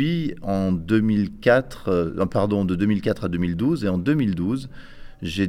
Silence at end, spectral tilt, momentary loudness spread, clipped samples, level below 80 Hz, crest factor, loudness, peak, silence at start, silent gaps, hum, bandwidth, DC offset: 0 s; -8 dB/octave; 7 LU; under 0.1%; -44 dBFS; 18 dB; -22 LUFS; -4 dBFS; 0 s; none; none; 13 kHz; under 0.1%